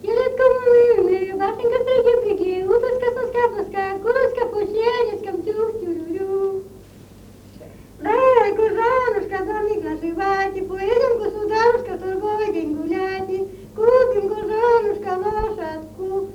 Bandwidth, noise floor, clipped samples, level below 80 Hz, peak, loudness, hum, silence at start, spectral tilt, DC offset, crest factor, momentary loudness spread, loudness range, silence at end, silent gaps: 10.5 kHz; -43 dBFS; under 0.1%; -46 dBFS; -2 dBFS; -20 LUFS; none; 0 s; -6 dB/octave; under 0.1%; 18 dB; 11 LU; 4 LU; 0 s; none